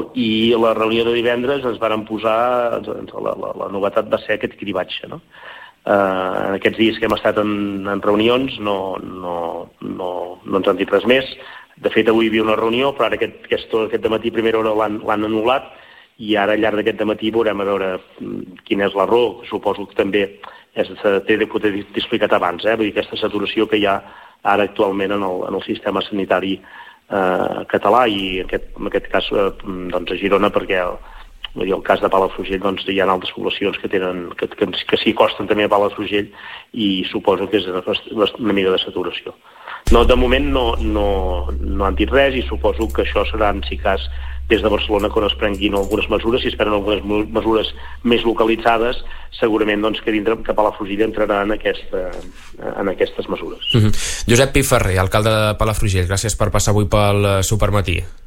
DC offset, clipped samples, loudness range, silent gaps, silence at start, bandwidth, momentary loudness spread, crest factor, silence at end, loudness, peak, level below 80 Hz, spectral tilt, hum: under 0.1%; under 0.1%; 3 LU; none; 0 s; 16.5 kHz; 10 LU; 16 dB; 0 s; -18 LUFS; -2 dBFS; -30 dBFS; -5 dB/octave; none